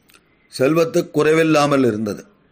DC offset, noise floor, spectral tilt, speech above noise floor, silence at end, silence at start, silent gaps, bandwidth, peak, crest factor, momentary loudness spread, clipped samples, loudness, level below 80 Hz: under 0.1%; -54 dBFS; -5.5 dB/octave; 38 dB; 0.3 s; 0.55 s; none; 15.5 kHz; -4 dBFS; 14 dB; 13 LU; under 0.1%; -17 LUFS; -58 dBFS